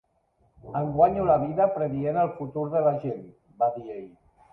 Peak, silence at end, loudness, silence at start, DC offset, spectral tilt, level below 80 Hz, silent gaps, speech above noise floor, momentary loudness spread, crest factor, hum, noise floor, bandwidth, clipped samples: -6 dBFS; 0.45 s; -25 LUFS; 0.65 s; under 0.1%; -11.5 dB/octave; -56 dBFS; none; 42 dB; 14 LU; 20 dB; none; -67 dBFS; 3.9 kHz; under 0.1%